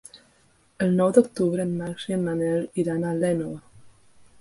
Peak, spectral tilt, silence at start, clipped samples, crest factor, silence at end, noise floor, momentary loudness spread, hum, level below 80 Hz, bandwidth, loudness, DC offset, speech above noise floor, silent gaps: -4 dBFS; -7 dB/octave; 0.15 s; under 0.1%; 22 dB; 0.5 s; -61 dBFS; 10 LU; none; -60 dBFS; 11.5 kHz; -24 LUFS; under 0.1%; 38 dB; none